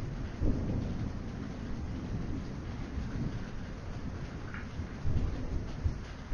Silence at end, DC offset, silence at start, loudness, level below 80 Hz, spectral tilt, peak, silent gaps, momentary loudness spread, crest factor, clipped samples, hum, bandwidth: 0 s; under 0.1%; 0 s; -38 LUFS; -40 dBFS; -7.5 dB/octave; -18 dBFS; none; 7 LU; 18 dB; under 0.1%; none; 7.2 kHz